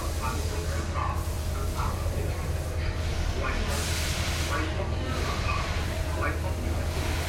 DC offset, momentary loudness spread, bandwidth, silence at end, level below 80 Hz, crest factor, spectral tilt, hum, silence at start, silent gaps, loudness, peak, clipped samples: under 0.1%; 3 LU; 16.5 kHz; 0 s; -34 dBFS; 14 dB; -4.5 dB/octave; none; 0 s; none; -30 LUFS; -14 dBFS; under 0.1%